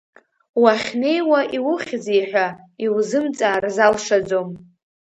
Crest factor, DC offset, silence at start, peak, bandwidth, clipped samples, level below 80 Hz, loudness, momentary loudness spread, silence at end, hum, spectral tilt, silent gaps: 18 dB; under 0.1%; 0.55 s; 0 dBFS; 8.8 kHz; under 0.1%; -62 dBFS; -19 LUFS; 8 LU; 0.4 s; none; -4 dB/octave; none